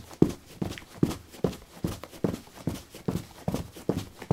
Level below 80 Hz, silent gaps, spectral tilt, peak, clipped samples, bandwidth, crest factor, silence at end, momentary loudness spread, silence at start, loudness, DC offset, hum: -50 dBFS; none; -7 dB/octave; -2 dBFS; under 0.1%; 16.5 kHz; 30 dB; 0.05 s; 9 LU; 0 s; -33 LUFS; under 0.1%; none